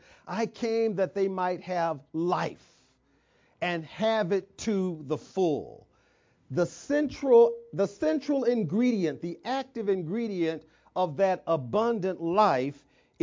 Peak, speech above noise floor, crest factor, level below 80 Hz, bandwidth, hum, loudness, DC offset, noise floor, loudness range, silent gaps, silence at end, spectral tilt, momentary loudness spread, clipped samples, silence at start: -10 dBFS; 40 dB; 18 dB; -66 dBFS; 7.6 kHz; none; -28 LUFS; under 0.1%; -67 dBFS; 5 LU; none; 0.5 s; -6.5 dB/octave; 9 LU; under 0.1%; 0.25 s